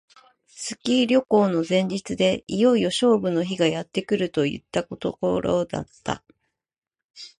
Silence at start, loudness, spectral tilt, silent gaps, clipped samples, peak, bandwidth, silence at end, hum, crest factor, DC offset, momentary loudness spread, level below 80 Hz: 0.55 s; -23 LUFS; -5.5 dB/octave; 6.78-6.82 s, 7.04-7.14 s; under 0.1%; -6 dBFS; 11.5 kHz; 0.1 s; none; 16 dB; under 0.1%; 12 LU; -56 dBFS